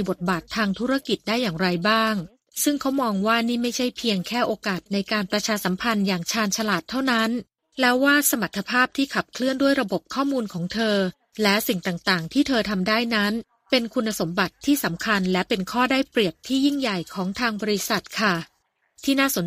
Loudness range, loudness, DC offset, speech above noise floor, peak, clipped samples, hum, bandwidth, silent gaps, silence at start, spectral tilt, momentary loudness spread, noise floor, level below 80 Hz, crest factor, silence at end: 2 LU; -23 LUFS; under 0.1%; 37 dB; -4 dBFS; under 0.1%; none; 15.5 kHz; none; 0 s; -4 dB/octave; 5 LU; -60 dBFS; -56 dBFS; 20 dB; 0 s